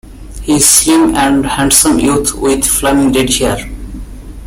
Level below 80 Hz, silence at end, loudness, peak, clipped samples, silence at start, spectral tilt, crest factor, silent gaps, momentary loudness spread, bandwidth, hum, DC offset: -28 dBFS; 0 s; -9 LUFS; 0 dBFS; 0.2%; 0.05 s; -3 dB/octave; 12 dB; none; 19 LU; over 20 kHz; none; under 0.1%